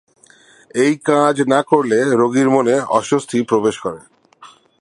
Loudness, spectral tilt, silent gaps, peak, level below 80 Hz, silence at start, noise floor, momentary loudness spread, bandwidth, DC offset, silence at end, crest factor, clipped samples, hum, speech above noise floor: -16 LUFS; -5.5 dB/octave; none; 0 dBFS; -62 dBFS; 0.75 s; -48 dBFS; 9 LU; 11.5 kHz; under 0.1%; 0.35 s; 16 dB; under 0.1%; none; 33 dB